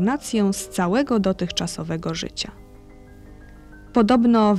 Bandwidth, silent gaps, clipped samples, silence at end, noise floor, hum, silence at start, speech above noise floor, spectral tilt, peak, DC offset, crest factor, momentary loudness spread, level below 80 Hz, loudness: 14 kHz; none; under 0.1%; 0 s; -44 dBFS; none; 0 s; 24 dB; -5.5 dB/octave; -6 dBFS; under 0.1%; 16 dB; 11 LU; -46 dBFS; -22 LUFS